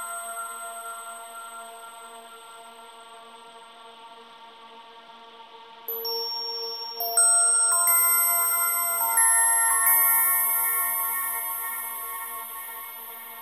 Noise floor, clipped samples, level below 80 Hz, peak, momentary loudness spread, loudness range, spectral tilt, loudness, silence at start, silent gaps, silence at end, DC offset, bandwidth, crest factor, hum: -47 dBFS; under 0.1%; -78 dBFS; -10 dBFS; 21 LU; 20 LU; 4 dB/octave; -21 LUFS; 0 s; none; 0 s; under 0.1%; 16 kHz; 16 dB; none